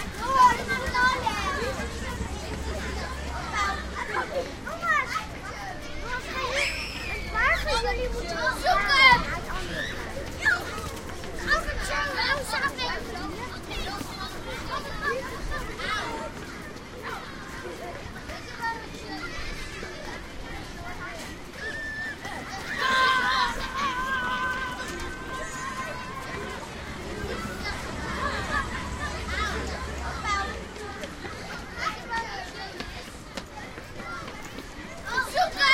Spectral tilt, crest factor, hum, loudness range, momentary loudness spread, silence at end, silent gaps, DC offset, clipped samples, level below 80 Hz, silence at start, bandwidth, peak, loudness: -3 dB/octave; 24 dB; none; 12 LU; 14 LU; 0 s; none; under 0.1%; under 0.1%; -40 dBFS; 0 s; 16 kHz; -4 dBFS; -28 LUFS